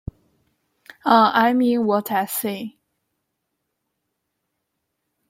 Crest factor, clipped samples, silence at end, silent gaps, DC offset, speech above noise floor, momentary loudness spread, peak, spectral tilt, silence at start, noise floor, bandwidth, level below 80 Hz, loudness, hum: 22 dB; under 0.1%; 2.6 s; none; under 0.1%; 59 dB; 17 LU; 0 dBFS; -4.5 dB/octave; 1.05 s; -77 dBFS; 16.5 kHz; -54 dBFS; -19 LUFS; none